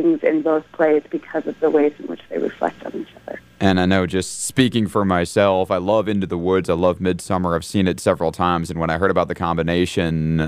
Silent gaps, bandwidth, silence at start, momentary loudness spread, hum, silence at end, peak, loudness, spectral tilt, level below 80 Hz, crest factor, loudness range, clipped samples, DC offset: none; 15.5 kHz; 0 s; 8 LU; none; 0 s; -2 dBFS; -19 LUFS; -6 dB/octave; -44 dBFS; 16 dB; 3 LU; under 0.1%; under 0.1%